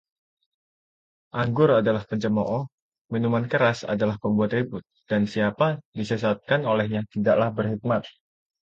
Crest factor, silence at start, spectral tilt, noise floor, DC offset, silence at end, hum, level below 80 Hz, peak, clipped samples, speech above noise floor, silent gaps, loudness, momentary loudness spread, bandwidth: 18 dB; 1.35 s; -7.5 dB/octave; under -90 dBFS; under 0.1%; 0.55 s; none; -58 dBFS; -8 dBFS; under 0.1%; over 67 dB; 2.72-2.92 s, 2.98-3.05 s, 5.85-5.93 s; -24 LUFS; 8 LU; 7.8 kHz